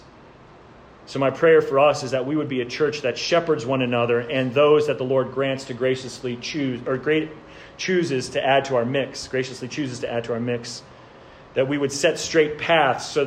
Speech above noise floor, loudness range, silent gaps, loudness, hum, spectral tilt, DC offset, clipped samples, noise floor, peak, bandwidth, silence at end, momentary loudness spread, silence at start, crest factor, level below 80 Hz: 25 dB; 4 LU; none; -22 LUFS; none; -5 dB/octave; under 0.1%; under 0.1%; -47 dBFS; -6 dBFS; 10.5 kHz; 0 s; 12 LU; 1.05 s; 16 dB; -58 dBFS